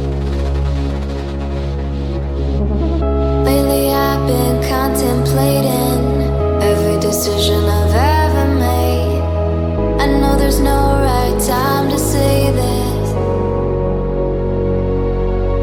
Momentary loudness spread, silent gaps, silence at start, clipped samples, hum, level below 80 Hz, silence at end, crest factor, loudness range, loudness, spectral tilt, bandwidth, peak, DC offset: 6 LU; none; 0 s; under 0.1%; none; -20 dBFS; 0 s; 14 dB; 3 LU; -15 LUFS; -6 dB/octave; 18 kHz; -2 dBFS; under 0.1%